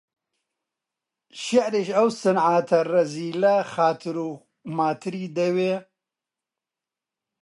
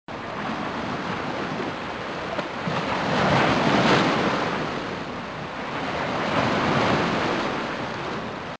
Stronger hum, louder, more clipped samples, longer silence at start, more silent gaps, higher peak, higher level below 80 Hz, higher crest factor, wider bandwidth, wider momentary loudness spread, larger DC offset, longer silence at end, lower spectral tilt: neither; about the same, -23 LUFS vs -24 LUFS; neither; first, 1.35 s vs 0.1 s; neither; about the same, -6 dBFS vs -6 dBFS; second, -76 dBFS vs -50 dBFS; about the same, 18 dB vs 18 dB; first, 11.5 kHz vs 8 kHz; about the same, 11 LU vs 11 LU; neither; first, 1.6 s vs 0.05 s; about the same, -5.5 dB/octave vs -5.5 dB/octave